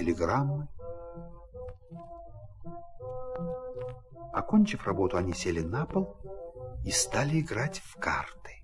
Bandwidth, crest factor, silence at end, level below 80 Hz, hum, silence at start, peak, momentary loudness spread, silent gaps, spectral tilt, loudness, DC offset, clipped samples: 12 kHz; 20 dB; 0 s; -50 dBFS; none; 0 s; -12 dBFS; 19 LU; none; -5 dB/octave; -31 LUFS; under 0.1%; under 0.1%